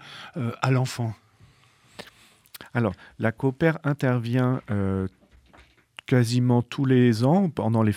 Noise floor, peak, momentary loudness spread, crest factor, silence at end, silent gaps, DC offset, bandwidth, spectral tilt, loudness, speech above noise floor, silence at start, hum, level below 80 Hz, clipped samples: -58 dBFS; -6 dBFS; 17 LU; 18 dB; 0 s; none; under 0.1%; 15 kHz; -7.5 dB/octave; -24 LUFS; 35 dB; 0 s; none; -60 dBFS; under 0.1%